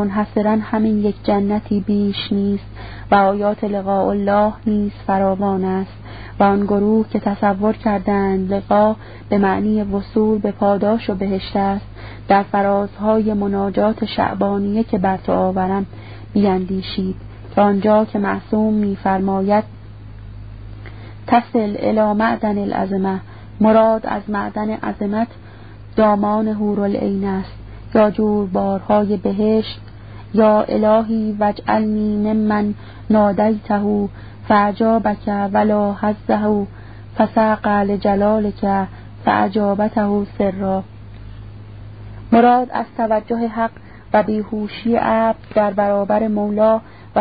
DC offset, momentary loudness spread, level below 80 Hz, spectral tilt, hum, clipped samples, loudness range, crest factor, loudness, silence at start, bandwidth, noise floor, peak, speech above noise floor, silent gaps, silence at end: 0.5%; 14 LU; -42 dBFS; -12 dB/octave; none; under 0.1%; 2 LU; 18 dB; -18 LUFS; 0 s; 5 kHz; -37 dBFS; 0 dBFS; 20 dB; none; 0 s